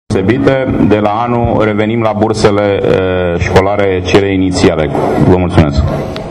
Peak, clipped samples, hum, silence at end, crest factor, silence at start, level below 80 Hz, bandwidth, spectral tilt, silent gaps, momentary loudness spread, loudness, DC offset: 0 dBFS; 0.6%; none; 0 s; 10 dB; 0.1 s; -26 dBFS; 12 kHz; -7 dB/octave; none; 3 LU; -11 LUFS; under 0.1%